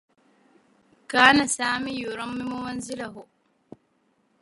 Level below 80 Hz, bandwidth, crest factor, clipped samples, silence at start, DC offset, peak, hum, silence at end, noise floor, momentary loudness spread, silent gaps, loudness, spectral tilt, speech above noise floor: -62 dBFS; 11.5 kHz; 26 dB; under 0.1%; 1.1 s; under 0.1%; -2 dBFS; none; 1.2 s; -68 dBFS; 17 LU; none; -23 LUFS; -2.5 dB/octave; 44 dB